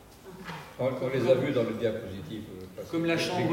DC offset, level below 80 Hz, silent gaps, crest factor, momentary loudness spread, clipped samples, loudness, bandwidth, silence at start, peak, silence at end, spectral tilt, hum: under 0.1%; -62 dBFS; none; 20 dB; 17 LU; under 0.1%; -29 LUFS; 16 kHz; 0 s; -10 dBFS; 0 s; -6 dB/octave; none